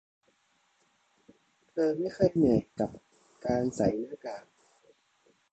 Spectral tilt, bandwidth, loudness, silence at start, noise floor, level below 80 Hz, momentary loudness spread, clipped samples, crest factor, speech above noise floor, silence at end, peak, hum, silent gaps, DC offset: -7.5 dB/octave; 8.8 kHz; -30 LUFS; 1.75 s; -71 dBFS; -58 dBFS; 15 LU; under 0.1%; 22 dB; 43 dB; 1.1 s; -12 dBFS; none; none; under 0.1%